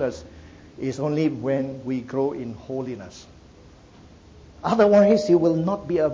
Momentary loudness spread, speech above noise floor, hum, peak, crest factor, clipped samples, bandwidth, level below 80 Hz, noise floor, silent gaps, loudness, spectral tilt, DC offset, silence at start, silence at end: 17 LU; 27 dB; none; -6 dBFS; 18 dB; under 0.1%; 7.8 kHz; -52 dBFS; -49 dBFS; none; -22 LUFS; -7.5 dB/octave; under 0.1%; 0 s; 0 s